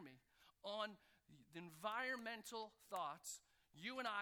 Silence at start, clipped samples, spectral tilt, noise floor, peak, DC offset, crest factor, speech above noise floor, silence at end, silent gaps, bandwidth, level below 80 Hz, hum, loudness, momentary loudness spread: 0 s; under 0.1%; -2.5 dB/octave; -74 dBFS; -32 dBFS; under 0.1%; 20 dB; 24 dB; 0 s; none; over 20 kHz; -88 dBFS; none; -49 LUFS; 14 LU